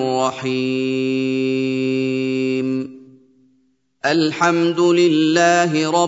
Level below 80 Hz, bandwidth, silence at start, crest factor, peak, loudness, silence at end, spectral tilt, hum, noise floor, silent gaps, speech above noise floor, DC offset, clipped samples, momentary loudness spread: -70 dBFS; 8 kHz; 0 s; 18 dB; 0 dBFS; -18 LUFS; 0 s; -5 dB/octave; none; -62 dBFS; none; 45 dB; under 0.1%; under 0.1%; 7 LU